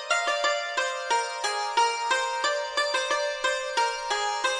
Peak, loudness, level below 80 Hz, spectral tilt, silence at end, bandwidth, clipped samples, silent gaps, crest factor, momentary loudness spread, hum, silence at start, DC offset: -10 dBFS; -26 LUFS; -64 dBFS; 2 dB/octave; 0 s; 11 kHz; under 0.1%; none; 16 dB; 3 LU; none; 0 s; under 0.1%